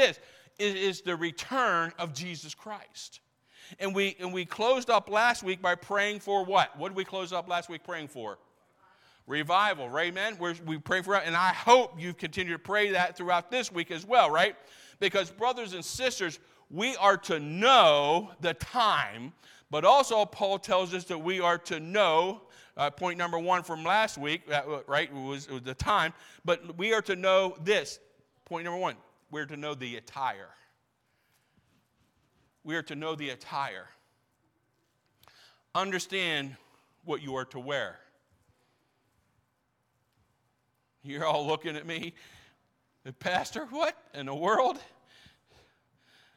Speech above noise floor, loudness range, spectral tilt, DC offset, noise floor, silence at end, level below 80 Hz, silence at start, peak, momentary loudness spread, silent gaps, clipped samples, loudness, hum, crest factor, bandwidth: 47 dB; 13 LU; -3.5 dB/octave; under 0.1%; -76 dBFS; 1.5 s; -64 dBFS; 0 s; -6 dBFS; 15 LU; none; under 0.1%; -29 LUFS; none; 24 dB; 16.5 kHz